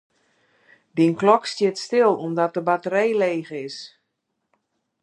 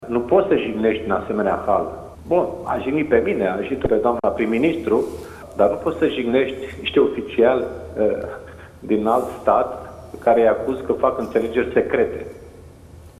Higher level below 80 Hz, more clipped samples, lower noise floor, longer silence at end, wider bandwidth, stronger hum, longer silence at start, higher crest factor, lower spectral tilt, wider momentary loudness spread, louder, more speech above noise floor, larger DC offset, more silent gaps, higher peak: second, -76 dBFS vs -46 dBFS; neither; first, -77 dBFS vs -43 dBFS; first, 1.15 s vs 0.1 s; second, 11 kHz vs 14 kHz; neither; first, 0.95 s vs 0 s; about the same, 22 dB vs 18 dB; second, -5.5 dB/octave vs -7 dB/octave; first, 14 LU vs 11 LU; about the same, -21 LUFS vs -20 LUFS; first, 56 dB vs 23 dB; neither; neither; about the same, -2 dBFS vs -2 dBFS